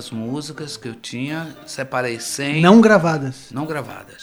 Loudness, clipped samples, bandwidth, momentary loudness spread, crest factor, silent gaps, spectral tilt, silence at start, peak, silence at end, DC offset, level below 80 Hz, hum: -18 LUFS; under 0.1%; 14.5 kHz; 19 LU; 18 dB; none; -5.5 dB/octave; 0 s; 0 dBFS; 0 s; under 0.1%; -60 dBFS; none